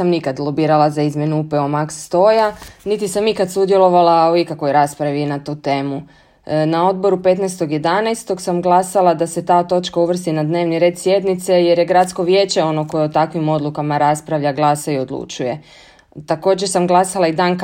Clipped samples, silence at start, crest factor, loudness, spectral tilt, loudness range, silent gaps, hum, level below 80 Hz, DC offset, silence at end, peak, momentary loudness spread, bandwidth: under 0.1%; 0 s; 16 dB; -16 LUFS; -5.5 dB/octave; 3 LU; none; none; -56 dBFS; under 0.1%; 0 s; 0 dBFS; 8 LU; 16 kHz